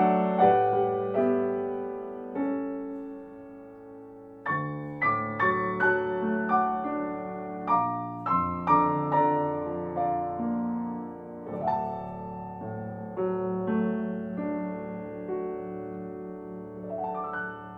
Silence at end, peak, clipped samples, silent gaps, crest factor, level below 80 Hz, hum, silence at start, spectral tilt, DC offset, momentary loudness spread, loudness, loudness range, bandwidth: 0 s; -8 dBFS; under 0.1%; none; 20 dB; -62 dBFS; none; 0 s; -9.5 dB/octave; under 0.1%; 15 LU; -29 LUFS; 8 LU; 5.2 kHz